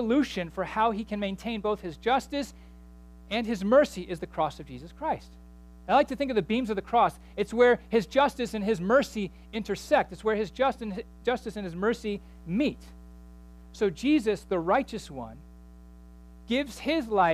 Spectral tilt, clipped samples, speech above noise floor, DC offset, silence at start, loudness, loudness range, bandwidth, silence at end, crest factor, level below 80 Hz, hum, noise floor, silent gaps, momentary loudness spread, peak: -5.5 dB/octave; under 0.1%; 22 dB; under 0.1%; 0 s; -28 LUFS; 5 LU; 15 kHz; 0 s; 18 dB; -50 dBFS; 60 Hz at -50 dBFS; -49 dBFS; none; 13 LU; -10 dBFS